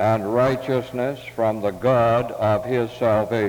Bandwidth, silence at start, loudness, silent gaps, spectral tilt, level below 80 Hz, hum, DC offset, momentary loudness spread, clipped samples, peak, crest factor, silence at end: over 20 kHz; 0 s; -21 LUFS; none; -7.5 dB/octave; -50 dBFS; none; under 0.1%; 6 LU; under 0.1%; -8 dBFS; 14 dB; 0 s